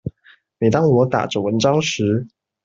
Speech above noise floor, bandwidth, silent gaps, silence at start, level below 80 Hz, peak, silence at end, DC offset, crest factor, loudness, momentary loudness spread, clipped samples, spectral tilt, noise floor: 36 dB; 7.8 kHz; none; 0.05 s; -54 dBFS; -2 dBFS; 0.4 s; under 0.1%; 16 dB; -18 LUFS; 9 LU; under 0.1%; -6 dB/octave; -53 dBFS